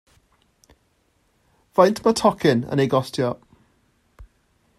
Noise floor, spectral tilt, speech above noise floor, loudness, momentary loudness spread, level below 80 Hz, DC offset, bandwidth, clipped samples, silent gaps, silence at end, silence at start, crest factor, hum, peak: -65 dBFS; -6 dB/octave; 46 dB; -20 LUFS; 8 LU; -56 dBFS; under 0.1%; 15.5 kHz; under 0.1%; none; 0.55 s; 1.75 s; 22 dB; none; -2 dBFS